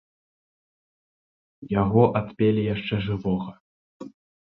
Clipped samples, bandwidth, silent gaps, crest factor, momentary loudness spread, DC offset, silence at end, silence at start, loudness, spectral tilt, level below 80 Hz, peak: under 0.1%; 5.2 kHz; 3.60-4.00 s; 22 dB; 24 LU; under 0.1%; 0.45 s; 1.6 s; -24 LUFS; -10 dB/octave; -50 dBFS; -4 dBFS